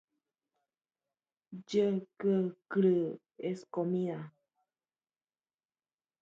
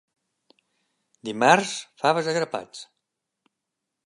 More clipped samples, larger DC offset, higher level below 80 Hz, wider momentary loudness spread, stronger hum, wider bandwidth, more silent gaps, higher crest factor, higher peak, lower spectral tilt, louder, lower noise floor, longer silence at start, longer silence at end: neither; neither; about the same, -82 dBFS vs -78 dBFS; second, 15 LU vs 20 LU; neither; second, 7.8 kHz vs 11.5 kHz; neither; second, 18 dB vs 24 dB; second, -18 dBFS vs -2 dBFS; first, -8 dB/octave vs -3.5 dB/octave; second, -33 LUFS vs -23 LUFS; first, under -90 dBFS vs -83 dBFS; first, 1.5 s vs 1.25 s; first, 1.9 s vs 1.2 s